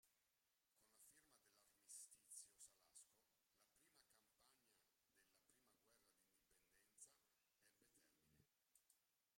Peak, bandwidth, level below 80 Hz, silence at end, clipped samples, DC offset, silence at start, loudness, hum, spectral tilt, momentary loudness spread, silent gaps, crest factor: -48 dBFS; 16 kHz; under -90 dBFS; 0 s; under 0.1%; under 0.1%; 0 s; -64 LUFS; none; 0 dB/octave; 8 LU; none; 26 dB